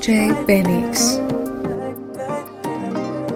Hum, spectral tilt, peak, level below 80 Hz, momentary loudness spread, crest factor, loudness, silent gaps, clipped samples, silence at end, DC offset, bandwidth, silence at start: none; -4.5 dB/octave; -2 dBFS; -46 dBFS; 11 LU; 18 dB; -20 LUFS; none; under 0.1%; 0 s; under 0.1%; 16.5 kHz; 0 s